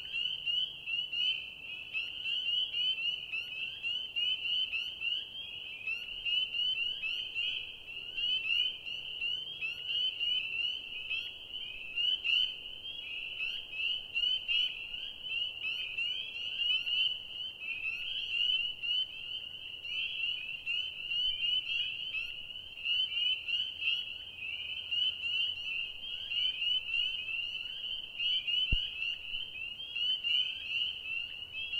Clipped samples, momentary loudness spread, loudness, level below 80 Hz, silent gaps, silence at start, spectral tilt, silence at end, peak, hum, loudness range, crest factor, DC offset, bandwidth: under 0.1%; 10 LU; -33 LUFS; -56 dBFS; none; 0 s; -1 dB/octave; 0 s; -16 dBFS; none; 2 LU; 20 dB; under 0.1%; 16 kHz